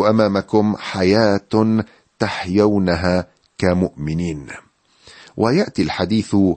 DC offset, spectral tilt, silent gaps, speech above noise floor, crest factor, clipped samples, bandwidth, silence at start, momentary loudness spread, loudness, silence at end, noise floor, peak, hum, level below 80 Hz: under 0.1%; -7 dB/octave; none; 32 dB; 16 dB; under 0.1%; 8.8 kHz; 0 s; 12 LU; -18 LUFS; 0 s; -49 dBFS; -2 dBFS; none; -44 dBFS